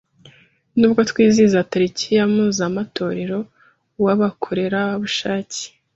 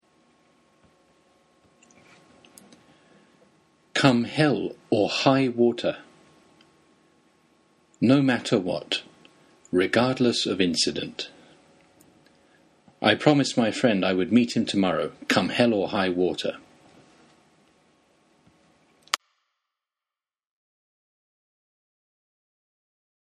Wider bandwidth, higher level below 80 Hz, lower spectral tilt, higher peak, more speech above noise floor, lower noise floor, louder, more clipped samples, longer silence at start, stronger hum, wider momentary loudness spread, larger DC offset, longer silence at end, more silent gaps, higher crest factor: second, 8 kHz vs 13 kHz; first, -58 dBFS vs -66 dBFS; about the same, -5 dB/octave vs -5 dB/octave; about the same, -2 dBFS vs 0 dBFS; second, 34 dB vs over 67 dB; second, -51 dBFS vs under -90 dBFS; first, -19 LUFS vs -23 LUFS; neither; second, 0.75 s vs 3.95 s; neither; about the same, 10 LU vs 10 LU; neither; second, 0.3 s vs 4.05 s; neither; second, 16 dB vs 26 dB